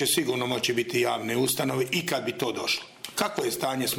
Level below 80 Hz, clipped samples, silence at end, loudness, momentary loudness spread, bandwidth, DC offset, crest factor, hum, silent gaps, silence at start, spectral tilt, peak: -68 dBFS; under 0.1%; 0 s; -27 LUFS; 4 LU; 17 kHz; under 0.1%; 20 dB; none; none; 0 s; -3 dB/octave; -8 dBFS